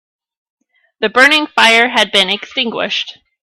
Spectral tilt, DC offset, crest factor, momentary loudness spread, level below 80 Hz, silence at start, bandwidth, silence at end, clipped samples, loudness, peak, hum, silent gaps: -2 dB/octave; under 0.1%; 14 dB; 10 LU; -58 dBFS; 1 s; 19 kHz; 0.3 s; 0.1%; -11 LUFS; 0 dBFS; none; none